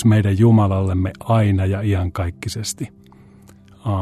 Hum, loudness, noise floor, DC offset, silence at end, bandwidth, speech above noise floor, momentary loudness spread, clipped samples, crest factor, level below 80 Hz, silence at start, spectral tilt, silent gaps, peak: none; -18 LUFS; -46 dBFS; under 0.1%; 0 s; 13.5 kHz; 29 dB; 13 LU; under 0.1%; 14 dB; -48 dBFS; 0 s; -7 dB/octave; none; -4 dBFS